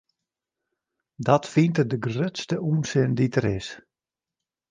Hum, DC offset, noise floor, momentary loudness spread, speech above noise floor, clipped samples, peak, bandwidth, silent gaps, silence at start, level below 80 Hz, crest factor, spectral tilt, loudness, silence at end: none; under 0.1%; -90 dBFS; 8 LU; 67 dB; under 0.1%; -4 dBFS; 9.4 kHz; none; 1.2 s; -56 dBFS; 22 dB; -6.5 dB/octave; -24 LUFS; 0.9 s